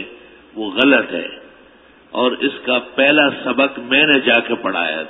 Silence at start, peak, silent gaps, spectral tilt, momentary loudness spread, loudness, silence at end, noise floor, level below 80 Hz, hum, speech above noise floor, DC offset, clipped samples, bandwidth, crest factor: 0 s; 0 dBFS; none; -6.5 dB/octave; 16 LU; -15 LUFS; 0 s; -47 dBFS; -60 dBFS; none; 31 dB; under 0.1%; under 0.1%; 4 kHz; 18 dB